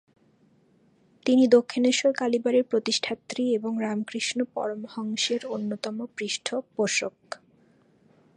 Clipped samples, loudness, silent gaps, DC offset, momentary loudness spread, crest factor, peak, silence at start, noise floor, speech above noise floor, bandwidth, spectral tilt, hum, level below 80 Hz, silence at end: under 0.1%; -26 LUFS; none; under 0.1%; 12 LU; 20 dB; -6 dBFS; 1.25 s; -62 dBFS; 37 dB; 11 kHz; -3.5 dB/octave; none; -78 dBFS; 1 s